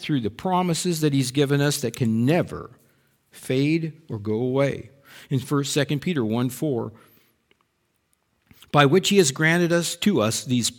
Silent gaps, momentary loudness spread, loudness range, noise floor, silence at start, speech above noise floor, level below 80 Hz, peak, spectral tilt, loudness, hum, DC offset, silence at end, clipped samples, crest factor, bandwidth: none; 11 LU; 5 LU; -71 dBFS; 0 s; 49 dB; -60 dBFS; -2 dBFS; -5 dB/octave; -22 LUFS; none; under 0.1%; 0.05 s; under 0.1%; 20 dB; 19 kHz